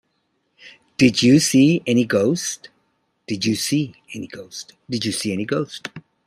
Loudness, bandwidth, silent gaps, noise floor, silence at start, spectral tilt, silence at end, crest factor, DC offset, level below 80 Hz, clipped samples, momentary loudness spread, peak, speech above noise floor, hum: -19 LUFS; 15 kHz; none; -70 dBFS; 0.65 s; -4.5 dB/octave; 0.25 s; 18 dB; under 0.1%; -58 dBFS; under 0.1%; 20 LU; -2 dBFS; 50 dB; none